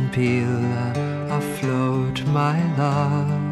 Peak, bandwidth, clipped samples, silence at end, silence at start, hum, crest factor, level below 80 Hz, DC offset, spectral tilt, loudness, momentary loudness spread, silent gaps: -8 dBFS; 12.5 kHz; under 0.1%; 0 s; 0 s; none; 14 dB; -52 dBFS; under 0.1%; -7.5 dB/octave; -22 LUFS; 4 LU; none